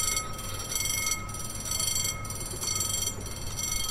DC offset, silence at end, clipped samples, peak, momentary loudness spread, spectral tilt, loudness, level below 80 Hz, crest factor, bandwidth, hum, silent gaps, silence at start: under 0.1%; 0 s; under 0.1%; -14 dBFS; 8 LU; -1 dB/octave; -29 LUFS; -42 dBFS; 18 dB; 16 kHz; none; none; 0 s